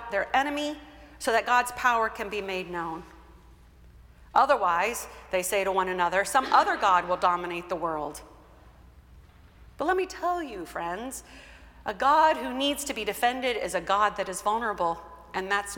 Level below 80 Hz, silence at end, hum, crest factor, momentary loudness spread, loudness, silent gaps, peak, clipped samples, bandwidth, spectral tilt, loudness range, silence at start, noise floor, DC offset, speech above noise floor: -54 dBFS; 0 s; none; 20 dB; 13 LU; -27 LUFS; none; -8 dBFS; under 0.1%; 17.5 kHz; -2.5 dB/octave; 8 LU; 0 s; -53 dBFS; under 0.1%; 26 dB